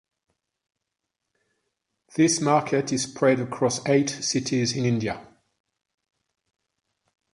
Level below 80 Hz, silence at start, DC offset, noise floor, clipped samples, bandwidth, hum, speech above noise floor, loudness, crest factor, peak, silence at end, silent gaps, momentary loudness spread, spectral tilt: -62 dBFS; 2.15 s; under 0.1%; -83 dBFS; under 0.1%; 11.5 kHz; none; 60 dB; -23 LUFS; 20 dB; -6 dBFS; 2.1 s; none; 6 LU; -4.5 dB/octave